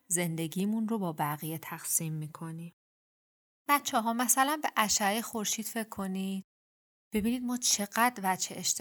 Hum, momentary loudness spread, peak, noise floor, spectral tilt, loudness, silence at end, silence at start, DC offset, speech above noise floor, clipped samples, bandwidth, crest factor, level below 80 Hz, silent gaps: none; 12 LU; -8 dBFS; under -90 dBFS; -3 dB/octave; -30 LUFS; 0 s; 0.1 s; under 0.1%; over 59 dB; under 0.1%; over 20 kHz; 24 dB; -66 dBFS; 2.73-3.65 s, 6.44-7.11 s